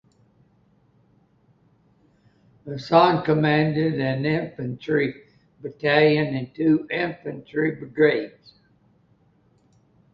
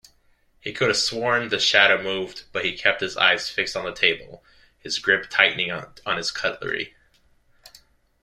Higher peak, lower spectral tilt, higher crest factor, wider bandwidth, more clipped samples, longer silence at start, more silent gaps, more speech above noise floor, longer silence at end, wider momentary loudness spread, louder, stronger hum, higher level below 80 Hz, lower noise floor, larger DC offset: about the same, -2 dBFS vs -2 dBFS; first, -8.5 dB/octave vs -2 dB/octave; about the same, 22 dB vs 24 dB; second, 6.4 kHz vs 15 kHz; neither; first, 2.65 s vs 0.65 s; neither; about the same, 39 dB vs 38 dB; first, 1.85 s vs 1.35 s; first, 17 LU vs 12 LU; about the same, -22 LUFS vs -21 LUFS; neither; about the same, -62 dBFS vs -58 dBFS; about the same, -61 dBFS vs -61 dBFS; neither